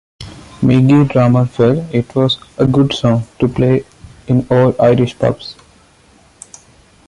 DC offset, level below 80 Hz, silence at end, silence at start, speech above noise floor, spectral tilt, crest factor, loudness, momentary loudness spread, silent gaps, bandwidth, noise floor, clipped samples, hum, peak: under 0.1%; -42 dBFS; 1.55 s; 0.2 s; 36 dB; -7.5 dB/octave; 12 dB; -13 LUFS; 8 LU; none; 11 kHz; -48 dBFS; under 0.1%; none; -2 dBFS